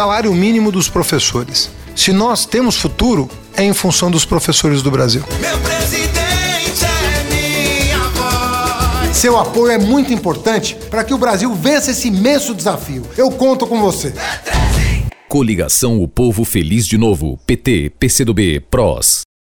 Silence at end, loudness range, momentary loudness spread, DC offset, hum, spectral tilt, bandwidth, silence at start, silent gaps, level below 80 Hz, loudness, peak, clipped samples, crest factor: 0.2 s; 2 LU; 5 LU; under 0.1%; none; -4 dB/octave; over 20 kHz; 0 s; none; -26 dBFS; -14 LUFS; 0 dBFS; under 0.1%; 14 dB